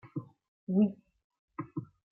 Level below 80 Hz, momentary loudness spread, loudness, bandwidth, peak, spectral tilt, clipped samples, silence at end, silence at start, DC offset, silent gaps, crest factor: -76 dBFS; 20 LU; -33 LUFS; 3 kHz; -18 dBFS; -12 dB/octave; under 0.1%; 0.3 s; 0.05 s; under 0.1%; 0.48-0.67 s, 1.24-1.30 s, 1.39-1.48 s; 18 dB